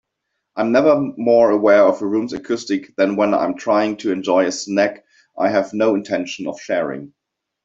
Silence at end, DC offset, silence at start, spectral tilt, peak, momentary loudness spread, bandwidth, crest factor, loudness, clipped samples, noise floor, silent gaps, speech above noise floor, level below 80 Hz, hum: 0.6 s; under 0.1%; 0.55 s; -5 dB/octave; -2 dBFS; 10 LU; 7.8 kHz; 16 dB; -18 LUFS; under 0.1%; -76 dBFS; none; 59 dB; -62 dBFS; none